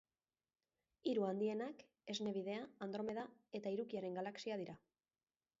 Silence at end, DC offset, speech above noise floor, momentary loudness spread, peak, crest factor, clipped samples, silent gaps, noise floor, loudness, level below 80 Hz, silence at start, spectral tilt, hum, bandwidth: 0.85 s; under 0.1%; over 46 dB; 10 LU; -28 dBFS; 16 dB; under 0.1%; none; under -90 dBFS; -45 LUFS; -86 dBFS; 1.05 s; -4.5 dB/octave; none; 7.6 kHz